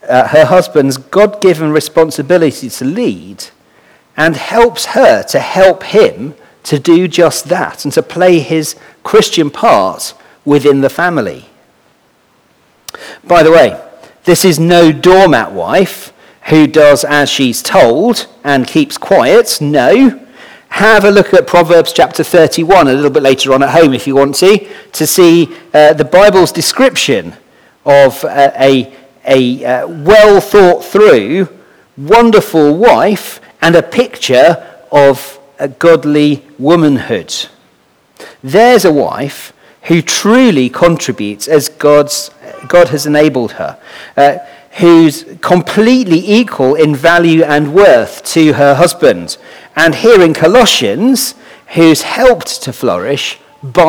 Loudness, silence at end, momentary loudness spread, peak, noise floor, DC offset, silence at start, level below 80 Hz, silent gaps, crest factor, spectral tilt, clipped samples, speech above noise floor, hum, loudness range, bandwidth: -8 LUFS; 0 s; 13 LU; 0 dBFS; -51 dBFS; under 0.1%; 0.05 s; -42 dBFS; none; 8 dB; -4.5 dB/octave; 3%; 43 dB; none; 4 LU; over 20 kHz